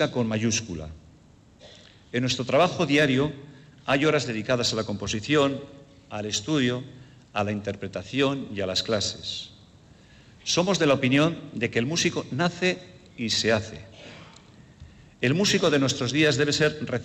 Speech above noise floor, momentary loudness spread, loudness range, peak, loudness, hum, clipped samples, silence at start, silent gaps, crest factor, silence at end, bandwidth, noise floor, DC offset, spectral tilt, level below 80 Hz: 29 dB; 16 LU; 4 LU; -10 dBFS; -25 LUFS; none; under 0.1%; 0 s; none; 16 dB; 0 s; 15.5 kHz; -54 dBFS; under 0.1%; -4 dB/octave; -58 dBFS